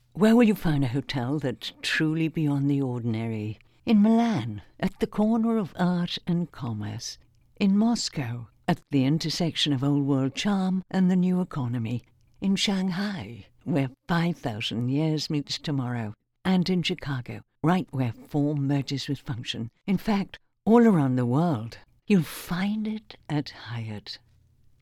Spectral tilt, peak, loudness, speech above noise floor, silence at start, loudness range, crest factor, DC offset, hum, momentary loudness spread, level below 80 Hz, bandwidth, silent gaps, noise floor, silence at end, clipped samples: -6 dB/octave; -6 dBFS; -26 LUFS; 34 dB; 0.15 s; 4 LU; 20 dB; under 0.1%; none; 13 LU; -52 dBFS; 15 kHz; none; -59 dBFS; 0.65 s; under 0.1%